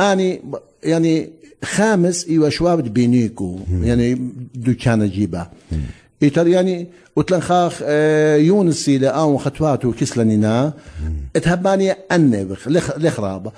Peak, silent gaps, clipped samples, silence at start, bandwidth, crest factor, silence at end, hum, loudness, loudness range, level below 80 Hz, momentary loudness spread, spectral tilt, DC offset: -4 dBFS; none; under 0.1%; 0 s; 11 kHz; 14 dB; 0.05 s; none; -17 LUFS; 3 LU; -38 dBFS; 12 LU; -6.5 dB/octave; under 0.1%